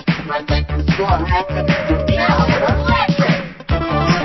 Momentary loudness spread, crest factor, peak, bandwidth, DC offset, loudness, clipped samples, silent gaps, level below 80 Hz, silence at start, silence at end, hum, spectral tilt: 5 LU; 16 dB; 0 dBFS; 6.2 kHz; under 0.1%; -16 LUFS; under 0.1%; none; -24 dBFS; 0 s; 0 s; none; -7 dB/octave